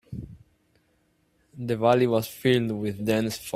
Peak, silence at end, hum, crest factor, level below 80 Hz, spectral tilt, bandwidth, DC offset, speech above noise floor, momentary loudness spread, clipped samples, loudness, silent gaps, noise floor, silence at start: -6 dBFS; 0.05 s; none; 20 dB; -58 dBFS; -6 dB/octave; 16 kHz; under 0.1%; 44 dB; 19 LU; under 0.1%; -24 LUFS; none; -68 dBFS; 0.1 s